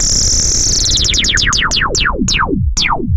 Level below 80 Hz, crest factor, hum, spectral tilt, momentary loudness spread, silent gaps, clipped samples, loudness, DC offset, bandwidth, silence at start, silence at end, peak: -20 dBFS; 12 dB; none; -1.5 dB/octave; 4 LU; none; under 0.1%; -11 LUFS; under 0.1%; 15 kHz; 0 s; 0 s; 0 dBFS